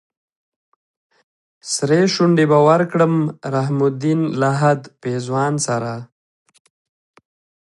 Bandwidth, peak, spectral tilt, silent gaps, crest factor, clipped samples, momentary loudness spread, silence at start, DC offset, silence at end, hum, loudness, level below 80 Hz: 11.5 kHz; -2 dBFS; -6 dB/octave; none; 18 dB; under 0.1%; 11 LU; 1.65 s; under 0.1%; 1.6 s; none; -17 LUFS; -66 dBFS